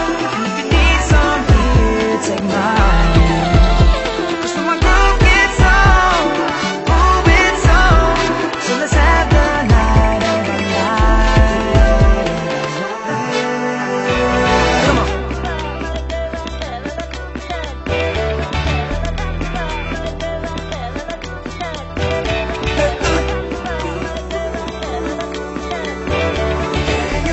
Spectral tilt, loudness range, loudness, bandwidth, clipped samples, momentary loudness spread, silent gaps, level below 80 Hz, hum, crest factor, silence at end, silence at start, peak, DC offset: -5.5 dB/octave; 9 LU; -16 LUFS; 8.4 kHz; under 0.1%; 13 LU; none; -18 dBFS; none; 14 dB; 0 s; 0 s; 0 dBFS; under 0.1%